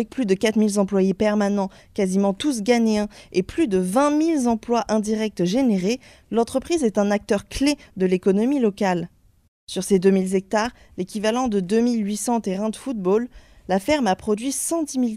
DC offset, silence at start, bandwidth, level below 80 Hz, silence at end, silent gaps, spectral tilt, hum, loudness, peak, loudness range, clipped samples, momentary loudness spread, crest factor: under 0.1%; 0 s; 15 kHz; -50 dBFS; 0 s; 9.48-9.67 s; -5.5 dB/octave; none; -22 LUFS; -6 dBFS; 2 LU; under 0.1%; 7 LU; 16 dB